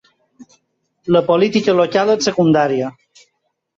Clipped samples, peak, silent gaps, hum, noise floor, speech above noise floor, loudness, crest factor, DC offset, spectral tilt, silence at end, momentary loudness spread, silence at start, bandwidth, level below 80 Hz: under 0.1%; -2 dBFS; none; none; -70 dBFS; 55 dB; -15 LUFS; 14 dB; under 0.1%; -5.5 dB/octave; 0.9 s; 8 LU; 0.4 s; 7.8 kHz; -58 dBFS